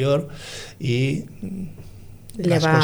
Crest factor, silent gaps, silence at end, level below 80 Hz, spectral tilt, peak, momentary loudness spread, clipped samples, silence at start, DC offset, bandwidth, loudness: 16 dB; none; 0 s; -46 dBFS; -6 dB/octave; -6 dBFS; 21 LU; under 0.1%; 0 s; under 0.1%; over 20 kHz; -24 LUFS